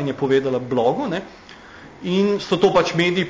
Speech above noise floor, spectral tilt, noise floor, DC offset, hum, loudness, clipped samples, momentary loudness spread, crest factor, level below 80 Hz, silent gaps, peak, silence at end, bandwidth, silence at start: 22 dB; -6 dB/octave; -42 dBFS; under 0.1%; none; -20 LUFS; under 0.1%; 14 LU; 14 dB; -54 dBFS; none; -6 dBFS; 0 s; 8 kHz; 0 s